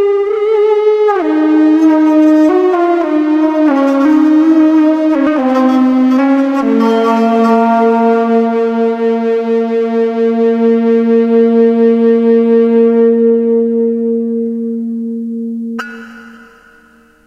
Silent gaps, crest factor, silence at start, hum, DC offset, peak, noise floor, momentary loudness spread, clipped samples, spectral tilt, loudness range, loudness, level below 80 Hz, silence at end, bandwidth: none; 10 dB; 0 s; none; under 0.1%; 0 dBFS; -45 dBFS; 8 LU; under 0.1%; -7.5 dB/octave; 4 LU; -11 LUFS; -60 dBFS; 0.9 s; 7.4 kHz